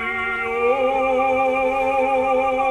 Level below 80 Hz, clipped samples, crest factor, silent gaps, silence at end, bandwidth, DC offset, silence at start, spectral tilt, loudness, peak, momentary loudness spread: -48 dBFS; under 0.1%; 12 dB; none; 0 s; 11 kHz; under 0.1%; 0 s; -5 dB/octave; -19 LUFS; -8 dBFS; 3 LU